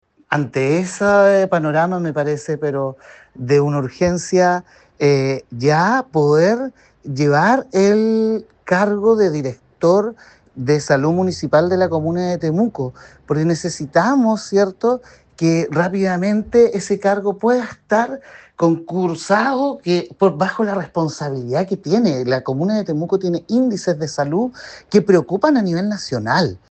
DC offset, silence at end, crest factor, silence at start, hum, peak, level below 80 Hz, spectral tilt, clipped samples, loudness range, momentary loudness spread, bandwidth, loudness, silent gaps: under 0.1%; 0.15 s; 16 dB; 0.3 s; none; 0 dBFS; -54 dBFS; -6.5 dB/octave; under 0.1%; 3 LU; 8 LU; 8.8 kHz; -17 LUFS; none